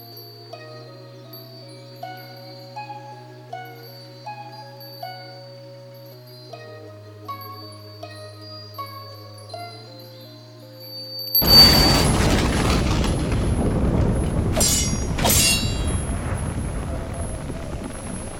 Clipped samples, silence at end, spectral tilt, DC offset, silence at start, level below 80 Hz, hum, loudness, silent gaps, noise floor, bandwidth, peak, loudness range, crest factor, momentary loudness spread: under 0.1%; 0 s; -3.5 dB/octave; under 0.1%; 0 s; -30 dBFS; none; -18 LUFS; none; -42 dBFS; 17 kHz; 0 dBFS; 22 LU; 22 dB; 24 LU